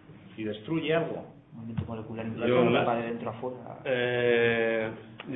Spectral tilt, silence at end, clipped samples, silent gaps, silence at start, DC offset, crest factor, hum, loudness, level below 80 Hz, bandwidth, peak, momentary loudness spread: -10 dB/octave; 0 s; under 0.1%; none; 0.1 s; under 0.1%; 20 dB; none; -29 LUFS; -62 dBFS; 4 kHz; -10 dBFS; 14 LU